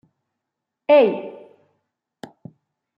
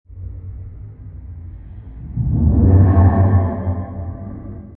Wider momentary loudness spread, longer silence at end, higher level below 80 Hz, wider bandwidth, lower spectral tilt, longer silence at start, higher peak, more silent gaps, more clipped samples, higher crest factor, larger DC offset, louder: about the same, 26 LU vs 24 LU; first, 1.65 s vs 0 s; second, -78 dBFS vs -28 dBFS; first, 5.4 kHz vs 2.3 kHz; second, -7 dB/octave vs -15 dB/octave; first, 0.9 s vs 0.1 s; second, -6 dBFS vs 0 dBFS; neither; neither; about the same, 18 dB vs 16 dB; neither; about the same, -17 LUFS vs -15 LUFS